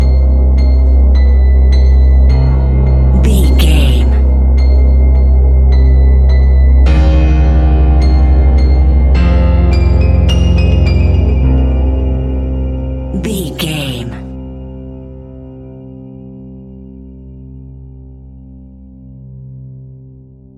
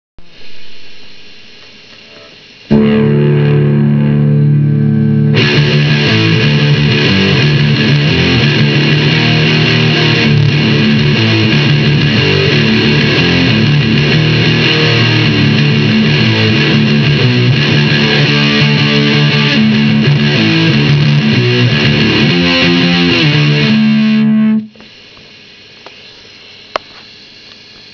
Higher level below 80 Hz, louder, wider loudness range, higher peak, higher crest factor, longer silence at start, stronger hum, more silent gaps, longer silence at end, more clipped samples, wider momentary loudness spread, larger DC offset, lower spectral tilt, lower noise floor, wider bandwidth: first, -10 dBFS vs -36 dBFS; about the same, -11 LUFS vs -9 LUFS; first, 17 LU vs 4 LU; about the same, 0 dBFS vs 0 dBFS; about the same, 10 dB vs 10 dB; second, 0 s vs 0.2 s; neither; neither; second, 0.65 s vs 0.9 s; second, under 0.1% vs 0.2%; first, 22 LU vs 1 LU; neither; about the same, -7.5 dB/octave vs -6.5 dB/octave; about the same, -37 dBFS vs -36 dBFS; first, 12 kHz vs 5.4 kHz